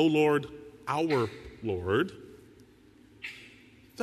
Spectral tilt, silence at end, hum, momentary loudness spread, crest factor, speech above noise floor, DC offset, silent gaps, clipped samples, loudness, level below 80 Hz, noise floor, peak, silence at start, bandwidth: -6.5 dB/octave; 0 s; none; 24 LU; 18 dB; 30 dB; under 0.1%; none; under 0.1%; -29 LUFS; -60 dBFS; -57 dBFS; -12 dBFS; 0 s; 13.5 kHz